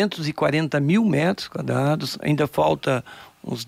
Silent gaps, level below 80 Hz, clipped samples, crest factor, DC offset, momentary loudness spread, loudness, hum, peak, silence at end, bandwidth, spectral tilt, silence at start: none; -56 dBFS; under 0.1%; 14 dB; under 0.1%; 8 LU; -22 LUFS; none; -8 dBFS; 0 s; 16 kHz; -6.5 dB/octave; 0 s